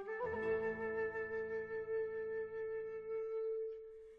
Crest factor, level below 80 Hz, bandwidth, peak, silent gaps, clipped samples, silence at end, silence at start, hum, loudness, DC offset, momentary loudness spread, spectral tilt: 14 dB; -72 dBFS; 4.8 kHz; -28 dBFS; none; under 0.1%; 0 s; 0 s; none; -42 LUFS; under 0.1%; 6 LU; -7.5 dB/octave